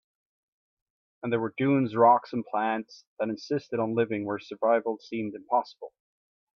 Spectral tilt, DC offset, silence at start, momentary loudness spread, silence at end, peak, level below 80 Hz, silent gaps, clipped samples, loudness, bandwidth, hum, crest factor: -7.5 dB/octave; under 0.1%; 1.25 s; 14 LU; 0.65 s; -8 dBFS; -74 dBFS; 3.07-3.17 s; under 0.1%; -27 LUFS; 6.6 kHz; none; 20 dB